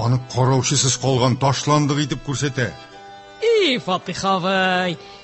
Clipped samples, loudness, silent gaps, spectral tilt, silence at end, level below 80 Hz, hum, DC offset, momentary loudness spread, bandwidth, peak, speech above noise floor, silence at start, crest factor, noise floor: under 0.1%; -19 LUFS; none; -4.5 dB/octave; 0 s; -50 dBFS; none; under 0.1%; 7 LU; 8.6 kHz; -4 dBFS; 21 dB; 0 s; 16 dB; -40 dBFS